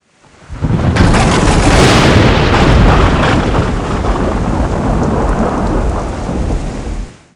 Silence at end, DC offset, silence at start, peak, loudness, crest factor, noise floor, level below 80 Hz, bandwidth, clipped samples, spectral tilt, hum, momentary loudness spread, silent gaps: 0.25 s; under 0.1%; 0.5 s; 0 dBFS; -12 LUFS; 10 dB; -42 dBFS; -16 dBFS; 11.5 kHz; 0.4%; -5.5 dB/octave; none; 11 LU; none